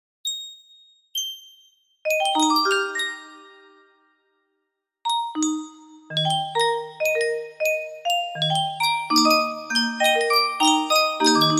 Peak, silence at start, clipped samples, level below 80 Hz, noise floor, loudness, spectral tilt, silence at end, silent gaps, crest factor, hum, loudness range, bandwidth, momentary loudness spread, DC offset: -4 dBFS; 0.25 s; under 0.1%; -74 dBFS; -78 dBFS; -22 LUFS; -2.5 dB/octave; 0 s; none; 18 dB; none; 8 LU; 16 kHz; 13 LU; under 0.1%